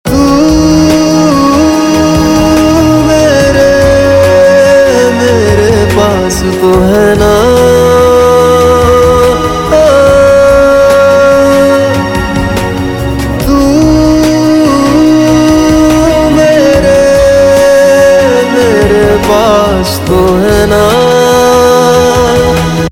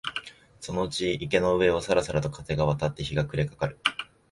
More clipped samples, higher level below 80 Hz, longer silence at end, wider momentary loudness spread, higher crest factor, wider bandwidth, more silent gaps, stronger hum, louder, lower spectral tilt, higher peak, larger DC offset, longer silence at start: first, 2% vs under 0.1%; first, -22 dBFS vs -48 dBFS; second, 0 s vs 0.3 s; second, 5 LU vs 11 LU; second, 6 dB vs 22 dB; first, 17 kHz vs 11.5 kHz; neither; neither; first, -6 LUFS vs -27 LUFS; about the same, -5.5 dB/octave vs -5.5 dB/octave; first, 0 dBFS vs -6 dBFS; first, 0.7% vs under 0.1%; about the same, 0.05 s vs 0.05 s